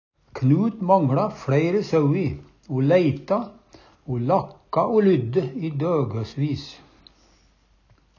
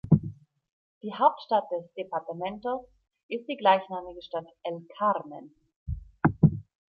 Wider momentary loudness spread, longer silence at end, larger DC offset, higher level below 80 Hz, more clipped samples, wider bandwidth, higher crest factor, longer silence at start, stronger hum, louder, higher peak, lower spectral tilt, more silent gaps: second, 12 LU vs 16 LU; first, 1.45 s vs 0.3 s; neither; about the same, -54 dBFS vs -50 dBFS; neither; first, 7.2 kHz vs 4.9 kHz; about the same, 18 dB vs 22 dB; first, 0.35 s vs 0.05 s; neither; first, -22 LUFS vs -28 LUFS; about the same, -4 dBFS vs -6 dBFS; second, -9 dB/octave vs -10.5 dB/octave; second, none vs 0.72-1.01 s, 3.23-3.29 s, 5.76-5.86 s